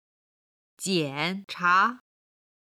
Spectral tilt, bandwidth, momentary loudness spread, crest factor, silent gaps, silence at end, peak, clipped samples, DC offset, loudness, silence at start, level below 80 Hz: -3.5 dB/octave; 15.5 kHz; 9 LU; 20 dB; none; 0.7 s; -8 dBFS; under 0.1%; under 0.1%; -25 LUFS; 0.8 s; -80 dBFS